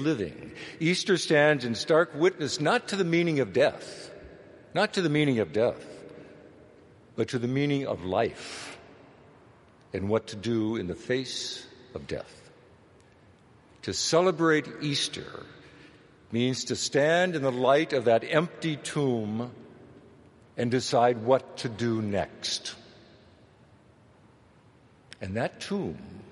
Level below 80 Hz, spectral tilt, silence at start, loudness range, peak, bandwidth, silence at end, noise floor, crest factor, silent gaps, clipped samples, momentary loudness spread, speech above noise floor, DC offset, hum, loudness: -64 dBFS; -4.5 dB/octave; 0 s; 9 LU; -6 dBFS; 11.5 kHz; 0 s; -58 dBFS; 22 dB; none; under 0.1%; 18 LU; 31 dB; under 0.1%; none; -27 LUFS